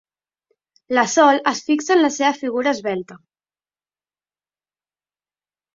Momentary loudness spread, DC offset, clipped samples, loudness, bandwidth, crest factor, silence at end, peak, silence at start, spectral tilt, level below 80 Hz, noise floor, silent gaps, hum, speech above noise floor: 9 LU; under 0.1%; under 0.1%; -18 LUFS; 7.8 kHz; 20 dB; 2.6 s; -2 dBFS; 0.9 s; -3 dB/octave; -68 dBFS; under -90 dBFS; none; 50 Hz at -60 dBFS; over 72 dB